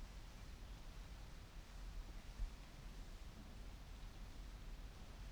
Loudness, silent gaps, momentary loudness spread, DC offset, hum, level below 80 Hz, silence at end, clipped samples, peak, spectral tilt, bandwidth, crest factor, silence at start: -57 LUFS; none; 4 LU; under 0.1%; none; -54 dBFS; 0 s; under 0.1%; -34 dBFS; -4.5 dB/octave; over 20 kHz; 18 dB; 0 s